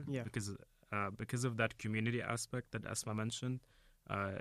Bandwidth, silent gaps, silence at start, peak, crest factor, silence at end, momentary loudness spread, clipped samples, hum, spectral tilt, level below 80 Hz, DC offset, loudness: 14.5 kHz; none; 0 s; -18 dBFS; 24 dB; 0 s; 7 LU; under 0.1%; none; -5 dB/octave; -66 dBFS; under 0.1%; -40 LUFS